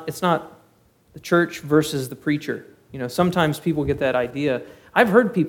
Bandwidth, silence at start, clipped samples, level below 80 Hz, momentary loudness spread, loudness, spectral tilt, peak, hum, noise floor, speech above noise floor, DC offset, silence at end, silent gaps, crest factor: 18 kHz; 0 s; under 0.1%; -50 dBFS; 13 LU; -21 LUFS; -6 dB/octave; 0 dBFS; none; -58 dBFS; 37 dB; under 0.1%; 0 s; none; 22 dB